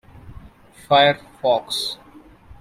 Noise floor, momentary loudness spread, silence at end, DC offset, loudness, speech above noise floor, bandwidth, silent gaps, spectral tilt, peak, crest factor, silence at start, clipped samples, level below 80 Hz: -46 dBFS; 12 LU; 0.1 s; under 0.1%; -19 LUFS; 27 dB; 15.5 kHz; none; -3.5 dB/octave; -2 dBFS; 20 dB; 0.25 s; under 0.1%; -52 dBFS